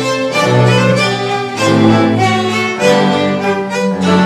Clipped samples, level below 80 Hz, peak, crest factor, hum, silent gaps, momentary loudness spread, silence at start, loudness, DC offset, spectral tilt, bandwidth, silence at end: under 0.1%; -46 dBFS; 0 dBFS; 12 dB; none; none; 6 LU; 0 s; -12 LUFS; under 0.1%; -5.5 dB/octave; 15 kHz; 0 s